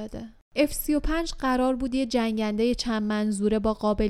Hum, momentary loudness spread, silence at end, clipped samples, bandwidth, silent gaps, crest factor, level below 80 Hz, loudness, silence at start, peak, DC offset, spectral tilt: none; 3 LU; 0 s; under 0.1%; 15 kHz; 0.41-0.51 s; 16 dB; -38 dBFS; -26 LUFS; 0 s; -10 dBFS; under 0.1%; -5 dB/octave